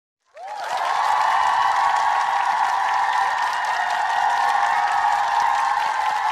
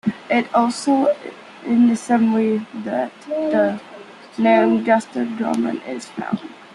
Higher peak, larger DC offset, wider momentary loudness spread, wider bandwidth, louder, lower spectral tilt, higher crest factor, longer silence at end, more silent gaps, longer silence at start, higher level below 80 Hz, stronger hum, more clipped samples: second, -8 dBFS vs -2 dBFS; neither; second, 4 LU vs 13 LU; first, 14.5 kHz vs 11.5 kHz; about the same, -20 LUFS vs -19 LUFS; second, 0.5 dB/octave vs -6 dB/octave; second, 12 dB vs 18 dB; about the same, 0 s vs 0.1 s; neither; first, 0.35 s vs 0.05 s; about the same, -64 dBFS vs -68 dBFS; neither; neither